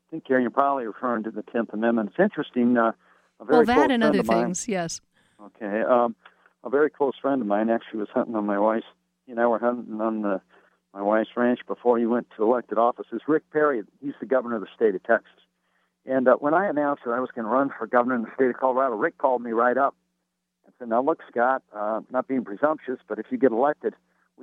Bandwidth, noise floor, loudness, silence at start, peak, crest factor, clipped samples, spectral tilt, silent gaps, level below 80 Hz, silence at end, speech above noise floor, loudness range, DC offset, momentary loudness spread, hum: 11.5 kHz; -79 dBFS; -24 LUFS; 0.1 s; -4 dBFS; 20 dB; under 0.1%; -5.5 dB/octave; none; -66 dBFS; 0.5 s; 55 dB; 3 LU; under 0.1%; 9 LU; none